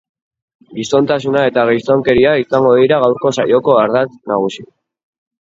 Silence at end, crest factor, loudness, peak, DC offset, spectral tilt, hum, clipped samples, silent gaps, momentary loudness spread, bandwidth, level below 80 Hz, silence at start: 0.75 s; 14 dB; -13 LUFS; 0 dBFS; under 0.1%; -6 dB/octave; none; under 0.1%; none; 7 LU; 7.8 kHz; -48 dBFS; 0.7 s